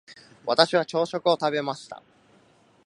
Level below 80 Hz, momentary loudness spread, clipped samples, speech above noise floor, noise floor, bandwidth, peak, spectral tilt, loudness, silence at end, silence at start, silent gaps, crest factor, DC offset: -74 dBFS; 18 LU; under 0.1%; 35 dB; -59 dBFS; 11 kHz; 0 dBFS; -4.5 dB/octave; -24 LUFS; 0.9 s; 0.1 s; none; 26 dB; under 0.1%